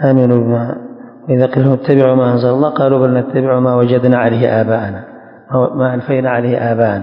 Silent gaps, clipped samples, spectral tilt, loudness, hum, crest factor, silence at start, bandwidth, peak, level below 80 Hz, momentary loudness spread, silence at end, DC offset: none; 0.3%; -11 dB/octave; -13 LUFS; none; 12 dB; 0 s; 5.4 kHz; 0 dBFS; -50 dBFS; 8 LU; 0 s; under 0.1%